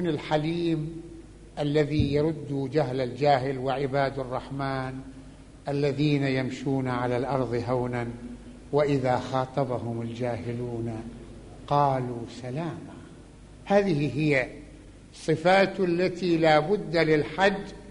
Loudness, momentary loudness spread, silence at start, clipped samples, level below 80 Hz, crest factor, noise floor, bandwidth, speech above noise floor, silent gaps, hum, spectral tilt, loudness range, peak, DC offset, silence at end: -27 LUFS; 18 LU; 0 s; under 0.1%; -50 dBFS; 20 dB; -47 dBFS; 10.5 kHz; 22 dB; none; none; -7 dB/octave; 5 LU; -8 dBFS; under 0.1%; 0 s